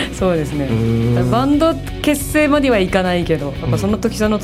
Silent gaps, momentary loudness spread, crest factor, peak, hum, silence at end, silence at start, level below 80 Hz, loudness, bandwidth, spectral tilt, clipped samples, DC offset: none; 5 LU; 14 dB; -2 dBFS; none; 0 s; 0 s; -30 dBFS; -16 LUFS; 16 kHz; -6 dB/octave; under 0.1%; under 0.1%